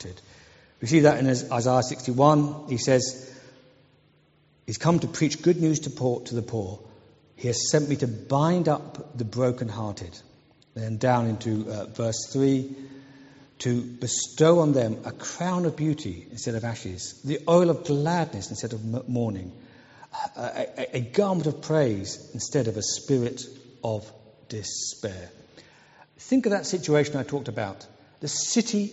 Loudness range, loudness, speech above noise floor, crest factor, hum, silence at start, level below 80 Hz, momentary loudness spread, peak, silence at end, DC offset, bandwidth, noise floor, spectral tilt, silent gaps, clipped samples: 5 LU; -26 LUFS; 37 dB; 22 dB; none; 0 s; -62 dBFS; 16 LU; -4 dBFS; 0 s; under 0.1%; 8 kHz; -62 dBFS; -6 dB/octave; none; under 0.1%